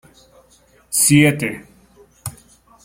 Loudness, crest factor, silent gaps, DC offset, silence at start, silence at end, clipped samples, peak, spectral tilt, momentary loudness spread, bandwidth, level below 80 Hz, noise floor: -15 LUFS; 18 dB; none; under 0.1%; 0.9 s; 0.55 s; under 0.1%; -2 dBFS; -4 dB/octave; 21 LU; 16.5 kHz; -52 dBFS; -53 dBFS